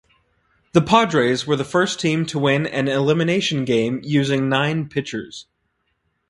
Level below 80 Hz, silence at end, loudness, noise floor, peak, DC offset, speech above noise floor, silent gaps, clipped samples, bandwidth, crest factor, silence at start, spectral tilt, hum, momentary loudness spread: -56 dBFS; 0.85 s; -19 LUFS; -70 dBFS; 0 dBFS; under 0.1%; 51 dB; none; under 0.1%; 11.5 kHz; 20 dB; 0.75 s; -5.5 dB/octave; none; 10 LU